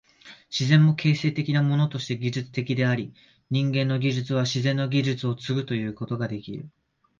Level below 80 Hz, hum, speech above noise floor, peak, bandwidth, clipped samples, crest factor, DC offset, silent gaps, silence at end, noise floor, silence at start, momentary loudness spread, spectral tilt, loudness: -62 dBFS; none; 26 dB; -6 dBFS; 7.4 kHz; under 0.1%; 18 dB; under 0.1%; none; 0.5 s; -50 dBFS; 0.25 s; 10 LU; -6.5 dB/octave; -25 LUFS